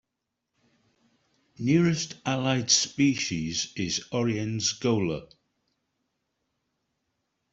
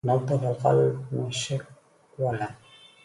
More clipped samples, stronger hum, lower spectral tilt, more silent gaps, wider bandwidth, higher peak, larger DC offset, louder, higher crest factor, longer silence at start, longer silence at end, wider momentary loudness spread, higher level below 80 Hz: neither; neither; second, -4 dB/octave vs -6 dB/octave; neither; second, 8.2 kHz vs 11.5 kHz; about the same, -6 dBFS vs -8 dBFS; neither; about the same, -26 LUFS vs -27 LUFS; first, 24 dB vs 18 dB; first, 1.6 s vs 0.05 s; first, 2.3 s vs 0.5 s; second, 8 LU vs 11 LU; about the same, -62 dBFS vs -62 dBFS